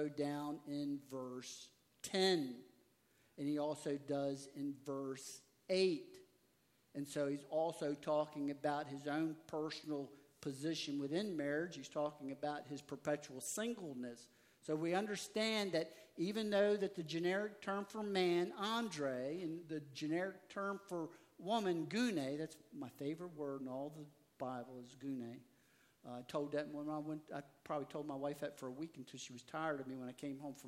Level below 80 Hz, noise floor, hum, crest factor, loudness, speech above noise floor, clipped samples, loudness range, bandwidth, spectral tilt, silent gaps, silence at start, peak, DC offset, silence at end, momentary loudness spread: -88 dBFS; -76 dBFS; none; 20 dB; -42 LUFS; 34 dB; under 0.1%; 7 LU; 16 kHz; -4.5 dB/octave; none; 0 s; -22 dBFS; under 0.1%; 0 s; 14 LU